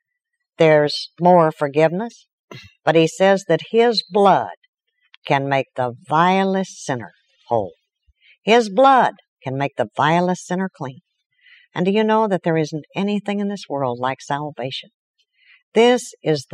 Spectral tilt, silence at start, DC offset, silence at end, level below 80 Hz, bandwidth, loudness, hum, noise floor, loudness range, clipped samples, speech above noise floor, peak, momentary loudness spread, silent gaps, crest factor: -5.5 dB/octave; 0.6 s; under 0.1%; 0.1 s; -70 dBFS; 12 kHz; -18 LUFS; none; -78 dBFS; 4 LU; under 0.1%; 60 dB; -2 dBFS; 13 LU; 2.33-2.48 s, 4.57-4.62 s, 4.68-4.73 s, 5.17-5.22 s, 9.28-9.37 s, 11.26-11.30 s, 14.94-15.14 s, 15.63-15.72 s; 18 dB